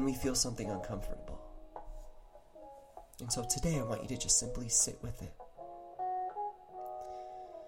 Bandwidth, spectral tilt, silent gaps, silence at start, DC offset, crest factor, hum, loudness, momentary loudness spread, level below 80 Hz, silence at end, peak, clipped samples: 16.5 kHz; -3 dB/octave; none; 0 s; under 0.1%; 22 dB; none; -35 LUFS; 24 LU; -50 dBFS; 0 s; -16 dBFS; under 0.1%